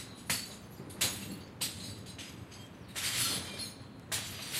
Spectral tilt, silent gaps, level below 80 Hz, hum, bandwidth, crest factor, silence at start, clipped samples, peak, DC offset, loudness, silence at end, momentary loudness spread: -1.5 dB/octave; none; -62 dBFS; none; 16 kHz; 24 dB; 0 s; under 0.1%; -16 dBFS; under 0.1%; -36 LUFS; 0 s; 16 LU